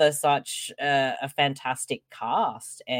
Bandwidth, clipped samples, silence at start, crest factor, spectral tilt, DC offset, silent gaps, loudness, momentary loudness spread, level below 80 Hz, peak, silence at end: 16.5 kHz; under 0.1%; 0 s; 18 dB; -3 dB/octave; under 0.1%; none; -26 LUFS; 9 LU; -74 dBFS; -8 dBFS; 0 s